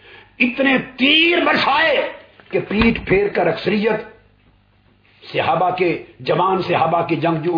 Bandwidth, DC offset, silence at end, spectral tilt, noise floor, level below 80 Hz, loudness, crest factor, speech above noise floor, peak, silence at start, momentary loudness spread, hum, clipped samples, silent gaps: 5.4 kHz; under 0.1%; 0 s; -7 dB/octave; -55 dBFS; -42 dBFS; -17 LUFS; 16 dB; 38 dB; -2 dBFS; 0.1 s; 8 LU; none; under 0.1%; none